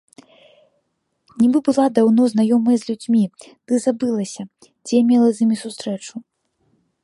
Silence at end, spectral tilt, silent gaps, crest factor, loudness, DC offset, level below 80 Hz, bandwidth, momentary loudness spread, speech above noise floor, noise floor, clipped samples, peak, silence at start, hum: 0.85 s; -6 dB/octave; none; 18 dB; -18 LUFS; under 0.1%; -68 dBFS; 11.5 kHz; 15 LU; 54 dB; -71 dBFS; under 0.1%; -2 dBFS; 1.35 s; none